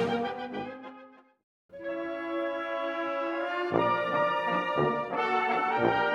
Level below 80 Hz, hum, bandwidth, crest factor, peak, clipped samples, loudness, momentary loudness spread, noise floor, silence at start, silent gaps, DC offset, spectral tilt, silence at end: -66 dBFS; none; 11 kHz; 20 dB; -10 dBFS; under 0.1%; -29 LUFS; 11 LU; -53 dBFS; 0 s; 1.44-1.69 s; under 0.1%; -6.5 dB/octave; 0 s